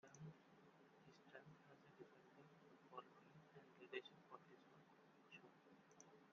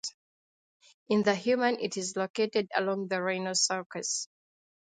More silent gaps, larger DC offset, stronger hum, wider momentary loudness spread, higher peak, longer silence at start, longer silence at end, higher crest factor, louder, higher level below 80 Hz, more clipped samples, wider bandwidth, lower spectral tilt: second, none vs 0.14-0.80 s, 0.94-1.06 s, 2.30-2.34 s, 3.86-3.90 s; neither; neither; first, 13 LU vs 6 LU; second, -36 dBFS vs -10 dBFS; about the same, 0.05 s vs 0.05 s; second, 0 s vs 0.65 s; first, 30 dB vs 22 dB; second, -64 LUFS vs -29 LUFS; second, under -90 dBFS vs -78 dBFS; neither; second, 7 kHz vs 9.6 kHz; about the same, -4 dB/octave vs -3 dB/octave